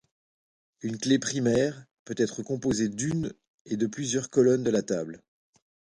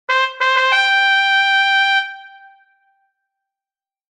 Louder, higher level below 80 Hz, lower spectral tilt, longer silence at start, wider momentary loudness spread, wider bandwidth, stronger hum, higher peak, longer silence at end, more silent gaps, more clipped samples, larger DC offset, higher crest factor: second, -27 LUFS vs -13 LUFS; first, -60 dBFS vs -72 dBFS; first, -5 dB/octave vs 4 dB/octave; first, 0.85 s vs 0.1 s; first, 14 LU vs 5 LU; about the same, 11.5 kHz vs 11 kHz; neither; second, -10 dBFS vs -2 dBFS; second, 0.8 s vs 1.9 s; first, 1.91-2.06 s, 3.48-3.65 s vs none; neither; neither; about the same, 18 dB vs 16 dB